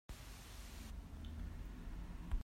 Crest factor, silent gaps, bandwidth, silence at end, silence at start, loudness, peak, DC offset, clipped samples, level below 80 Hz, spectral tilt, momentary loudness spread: 18 dB; none; 16 kHz; 0 s; 0.1 s; -52 LUFS; -30 dBFS; under 0.1%; under 0.1%; -48 dBFS; -5 dB/octave; 4 LU